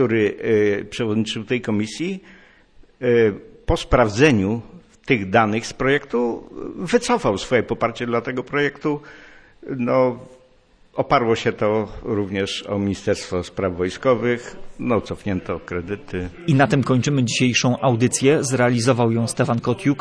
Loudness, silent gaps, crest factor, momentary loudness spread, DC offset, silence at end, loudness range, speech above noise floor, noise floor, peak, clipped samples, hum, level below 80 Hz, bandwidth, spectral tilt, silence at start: -20 LUFS; none; 18 dB; 11 LU; under 0.1%; 0 s; 5 LU; 34 dB; -54 dBFS; -2 dBFS; under 0.1%; none; -42 dBFS; 11 kHz; -5.5 dB/octave; 0 s